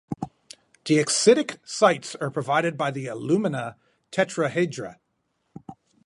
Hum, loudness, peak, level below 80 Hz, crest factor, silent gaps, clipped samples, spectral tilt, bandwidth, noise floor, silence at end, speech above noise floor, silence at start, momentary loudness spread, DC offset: none; -23 LUFS; -4 dBFS; -68 dBFS; 20 dB; none; under 0.1%; -4 dB/octave; 11.5 kHz; -74 dBFS; 0.35 s; 50 dB; 0.1 s; 18 LU; under 0.1%